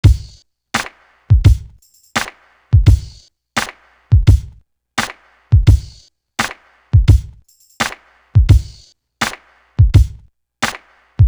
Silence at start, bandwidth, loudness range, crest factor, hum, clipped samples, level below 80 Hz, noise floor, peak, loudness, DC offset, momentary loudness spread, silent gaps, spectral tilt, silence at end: 0.05 s; over 20 kHz; 1 LU; 14 dB; none; under 0.1%; -20 dBFS; -47 dBFS; 0 dBFS; -16 LUFS; under 0.1%; 15 LU; none; -5.5 dB/octave; 0 s